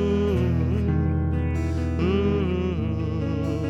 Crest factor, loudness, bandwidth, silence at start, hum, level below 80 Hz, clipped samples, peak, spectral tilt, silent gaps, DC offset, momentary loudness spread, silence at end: 12 dB; -24 LUFS; 7.4 kHz; 0 s; none; -36 dBFS; under 0.1%; -10 dBFS; -9 dB/octave; none; under 0.1%; 4 LU; 0 s